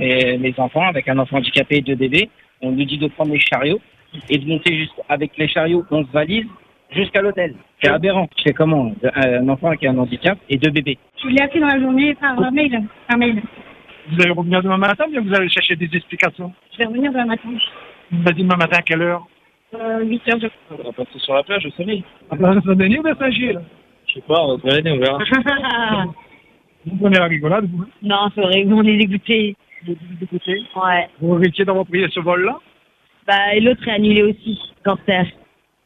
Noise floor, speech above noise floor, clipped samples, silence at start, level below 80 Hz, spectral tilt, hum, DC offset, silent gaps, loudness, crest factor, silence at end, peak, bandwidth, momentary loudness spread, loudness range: -57 dBFS; 40 dB; under 0.1%; 0 s; -52 dBFS; -7 dB/octave; none; under 0.1%; none; -17 LUFS; 18 dB; 0.55 s; 0 dBFS; 9 kHz; 11 LU; 2 LU